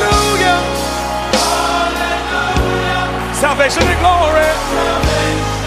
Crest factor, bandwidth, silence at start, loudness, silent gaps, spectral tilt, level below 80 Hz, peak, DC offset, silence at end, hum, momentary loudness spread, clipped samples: 14 dB; 15.5 kHz; 0 s; -14 LUFS; none; -4 dB/octave; -24 dBFS; 0 dBFS; under 0.1%; 0 s; none; 6 LU; under 0.1%